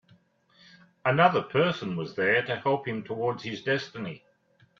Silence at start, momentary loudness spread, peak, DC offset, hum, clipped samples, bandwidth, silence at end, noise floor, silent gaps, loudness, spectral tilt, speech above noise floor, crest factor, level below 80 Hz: 1.05 s; 13 LU; -6 dBFS; under 0.1%; none; under 0.1%; 7.4 kHz; 0.6 s; -64 dBFS; none; -27 LUFS; -6.5 dB/octave; 37 dB; 22 dB; -70 dBFS